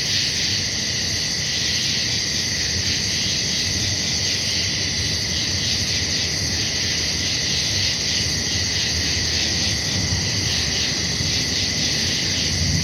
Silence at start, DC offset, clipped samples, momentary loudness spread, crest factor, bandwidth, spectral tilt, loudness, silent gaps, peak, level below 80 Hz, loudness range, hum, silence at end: 0 s; under 0.1%; under 0.1%; 1 LU; 14 dB; 20 kHz; -1.5 dB/octave; -19 LUFS; none; -8 dBFS; -38 dBFS; 0 LU; none; 0 s